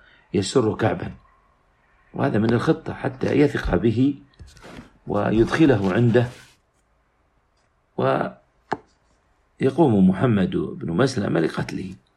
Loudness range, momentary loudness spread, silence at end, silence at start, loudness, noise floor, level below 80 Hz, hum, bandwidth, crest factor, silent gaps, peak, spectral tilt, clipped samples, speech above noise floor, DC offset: 5 LU; 15 LU; 0.2 s; 0.35 s; -21 LUFS; -65 dBFS; -44 dBFS; none; 11.5 kHz; 18 dB; none; -6 dBFS; -7 dB/octave; under 0.1%; 44 dB; under 0.1%